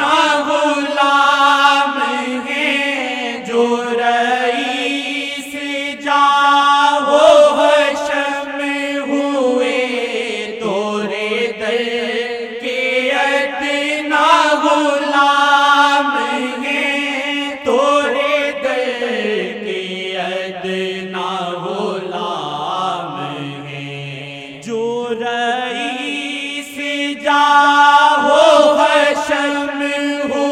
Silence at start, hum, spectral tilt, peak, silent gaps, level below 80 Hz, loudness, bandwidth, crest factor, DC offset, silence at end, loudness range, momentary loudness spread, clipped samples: 0 s; none; -3 dB/octave; 0 dBFS; none; -62 dBFS; -15 LUFS; 14.5 kHz; 16 dB; under 0.1%; 0 s; 9 LU; 12 LU; under 0.1%